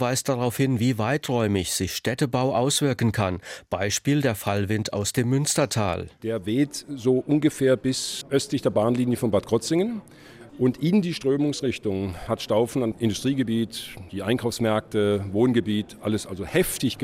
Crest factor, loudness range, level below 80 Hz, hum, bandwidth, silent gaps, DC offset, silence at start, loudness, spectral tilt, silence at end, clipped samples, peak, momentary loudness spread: 14 dB; 2 LU; -52 dBFS; none; 16.5 kHz; none; under 0.1%; 0 s; -24 LUFS; -5 dB/octave; 0 s; under 0.1%; -8 dBFS; 6 LU